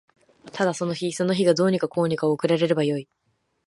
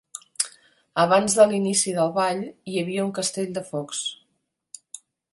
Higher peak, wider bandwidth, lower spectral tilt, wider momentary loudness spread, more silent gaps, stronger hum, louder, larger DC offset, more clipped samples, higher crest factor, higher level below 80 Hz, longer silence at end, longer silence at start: about the same, -6 dBFS vs -4 dBFS; about the same, 11.5 kHz vs 12 kHz; first, -6 dB/octave vs -3.5 dB/octave; second, 7 LU vs 18 LU; neither; neither; about the same, -23 LUFS vs -23 LUFS; neither; neither; about the same, 18 dB vs 22 dB; about the same, -68 dBFS vs -68 dBFS; first, 0.65 s vs 0.35 s; first, 0.45 s vs 0.15 s